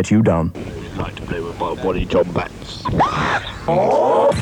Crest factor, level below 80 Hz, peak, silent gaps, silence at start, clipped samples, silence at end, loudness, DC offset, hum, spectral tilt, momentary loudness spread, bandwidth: 14 dB; -36 dBFS; -4 dBFS; none; 0 s; under 0.1%; 0 s; -19 LUFS; under 0.1%; none; -6.5 dB/octave; 12 LU; 19 kHz